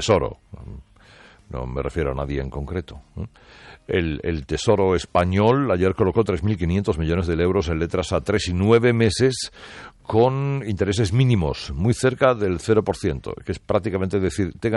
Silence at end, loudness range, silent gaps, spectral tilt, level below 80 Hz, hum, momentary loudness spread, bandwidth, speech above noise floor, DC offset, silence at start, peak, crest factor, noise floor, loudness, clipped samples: 0 s; 7 LU; none; -6.5 dB/octave; -40 dBFS; none; 14 LU; 11.5 kHz; 28 dB; under 0.1%; 0 s; -6 dBFS; 16 dB; -49 dBFS; -21 LUFS; under 0.1%